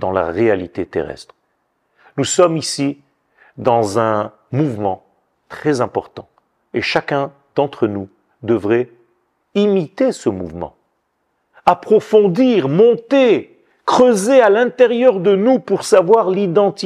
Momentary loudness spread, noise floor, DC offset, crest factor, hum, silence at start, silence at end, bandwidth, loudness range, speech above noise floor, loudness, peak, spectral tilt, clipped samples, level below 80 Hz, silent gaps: 14 LU; -68 dBFS; under 0.1%; 16 dB; none; 0 s; 0 s; 13.5 kHz; 8 LU; 53 dB; -15 LUFS; 0 dBFS; -5.5 dB/octave; under 0.1%; -56 dBFS; none